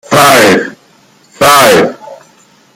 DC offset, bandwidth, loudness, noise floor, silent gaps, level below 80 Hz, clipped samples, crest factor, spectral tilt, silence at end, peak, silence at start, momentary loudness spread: under 0.1%; over 20 kHz; -6 LUFS; -45 dBFS; none; -46 dBFS; 0.5%; 8 dB; -3 dB/octave; 0.6 s; 0 dBFS; 0.1 s; 10 LU